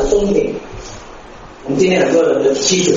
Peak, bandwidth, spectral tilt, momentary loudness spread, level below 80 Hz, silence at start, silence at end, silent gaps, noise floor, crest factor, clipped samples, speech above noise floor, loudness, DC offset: 0 dBFS; 7.8 kHz; -4 dB/octave; 21 LU; -34 dBFS; 0 s; 0 s; none; -35 dBFS; 16 dB; under 0.1%; 22 dB; -14 LUFS; under 0.1%